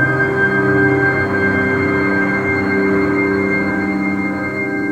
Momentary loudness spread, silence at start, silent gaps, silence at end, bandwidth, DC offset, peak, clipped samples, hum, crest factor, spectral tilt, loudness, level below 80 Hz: 5 LU; 0 s; none; 0 s; 9.4 kHz; under 0.1%; -2 dBFS; under 0.1%; none; 12 dB; -8 dB/octave; -15 LUFS; -44 dBFS